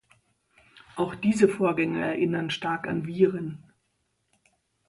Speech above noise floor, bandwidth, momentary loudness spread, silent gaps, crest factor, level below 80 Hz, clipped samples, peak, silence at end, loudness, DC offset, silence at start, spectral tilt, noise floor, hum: 49 dB; 11.5 kHz; 13 LU; none; 22 dB; -64 dBFS; under 0.1%; -6 dBFS; 1.3 s; -26 LUFS; under 0.1%; 0.75 s; -6.5 dB/octave; -74 dBFS; none